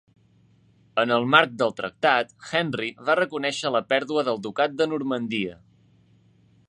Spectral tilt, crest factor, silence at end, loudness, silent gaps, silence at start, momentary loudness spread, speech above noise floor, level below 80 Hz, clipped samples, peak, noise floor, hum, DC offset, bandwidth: -4.5 dB/octave; 24 dB; 1.15 s; -24 LUFS; none; 0.95 s; 10 LU; 35 dB; -68 dBFS; under 0.1%; 0 dBFS; -59 dBFS; none; under 0.1%; 10.5 kHz